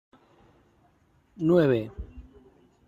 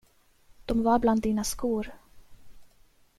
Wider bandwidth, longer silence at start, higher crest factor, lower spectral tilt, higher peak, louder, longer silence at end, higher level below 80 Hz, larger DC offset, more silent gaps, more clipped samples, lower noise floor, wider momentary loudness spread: second, 7.4 kHz vs 15 kHz; first, 1.4 s vs 0.6 s; about the same, 18 dB vs 20 dB; first, -9 dB/octave vs -5 dB/octave; about the same, -10 dBFS vs -10 dBFS; first, -24 LUFS vs -27 LUFS; about the same, 0.65 s vs 0.55 s; about the same, -50 dBFS vs -46 dBFS; neither; neither; neither; first, -64 dBFS vs -60 dBFS; first, 23 LU vs 14 LU